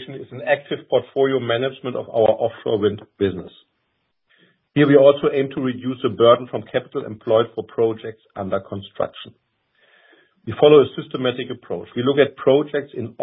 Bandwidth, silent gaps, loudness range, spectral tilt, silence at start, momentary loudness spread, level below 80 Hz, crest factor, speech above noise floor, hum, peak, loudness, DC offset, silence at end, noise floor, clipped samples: 4 kHz; none; 6 LU; -11 dB/octave; 0 s; 16 LU; -56 dBFS; 20 dB; 52 dB; none; 0 dBFS; -19 LUFS; under 0.1%; 0 s; -71 dBFS; under 0.1%